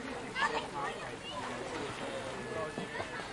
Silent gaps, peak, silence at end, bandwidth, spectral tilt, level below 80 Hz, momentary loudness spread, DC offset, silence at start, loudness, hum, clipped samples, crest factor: none; -18 dBFS; 0 s; 11.5 kHz; -3.5 dB/octave; -62 dBFS; 7 LU; under 0.1%; 0 s; -38 LUFS; none; under 0.1%; 20 dB